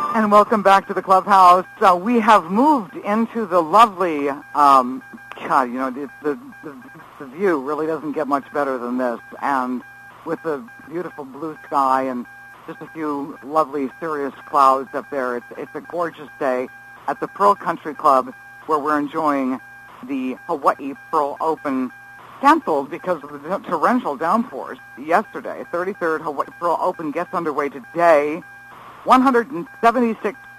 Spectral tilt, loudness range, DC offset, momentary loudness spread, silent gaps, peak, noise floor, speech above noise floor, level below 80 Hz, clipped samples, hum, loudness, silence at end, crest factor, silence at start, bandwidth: -5.5 dB/octave; 9 LU; under 0.1%; 17 LU; none; 0 dBFS; -40 dBFS; 21 dB; -64 dBFS; under 0.1%; none; -19 LUFS; 0 s; 20 dB; 0 s; 15.5 kHz